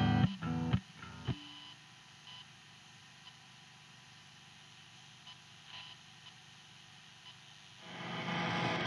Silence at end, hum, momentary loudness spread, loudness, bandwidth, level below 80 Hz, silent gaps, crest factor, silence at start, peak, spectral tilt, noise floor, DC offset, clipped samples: 0 s; 50 Hz at -70 dBFS; 20 LU; -39 LUFS; 11.5 kHz; -60 dBFS; none; 24 dB; 0 s; -16 dBFS; -6 dB/octave; -58 dBFS; under 0.1%; under 0.1%